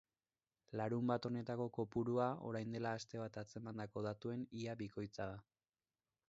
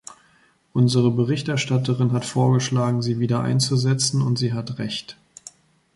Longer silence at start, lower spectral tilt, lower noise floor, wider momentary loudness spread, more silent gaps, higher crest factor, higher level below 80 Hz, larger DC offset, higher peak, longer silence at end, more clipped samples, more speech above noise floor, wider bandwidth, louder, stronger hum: about the same, 0.7 s vs 0.75 s; about the same, -6.5 dB/octave vs -5.5 dB/octave; first, under -90 dBFS vs -59 dBFS; about the same, 10 LU vs 10 LU; neither; about the same, 20 dB vs 16 dB; second, -74 dBFS vs -58 dBFS; neither; second, -24 dBFS vs -6 dBFS; about the same, 0.9 s vs 0.85 s; neither; first, over 47 dB vs 39 dB; second, 7.6 kHz vs 11.5 kHz; second, -44 LUFS vs -21 LUFS; neither